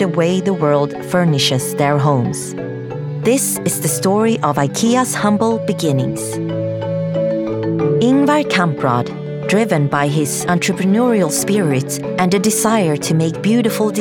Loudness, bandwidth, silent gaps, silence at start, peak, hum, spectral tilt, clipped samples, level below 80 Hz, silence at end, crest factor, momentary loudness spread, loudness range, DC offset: -16 LUFS; 19.5 kHz; none; 0 s; -2 dBFS; none; -5 dB/octave; under 0.1%; -54 dBFS; 0 s; 14 dB; 7 LU; 2 LU; under 0.1%